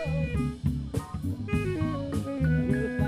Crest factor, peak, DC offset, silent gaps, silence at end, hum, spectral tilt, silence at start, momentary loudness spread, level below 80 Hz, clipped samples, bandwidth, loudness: 16 dB; -12 dBFS; under 0.1%; none; 0 s; none; -8 dB/octave; 0 s; 7 LU; -38 dBFS; under 0.1%; 14.5 kHz; -30 LUFS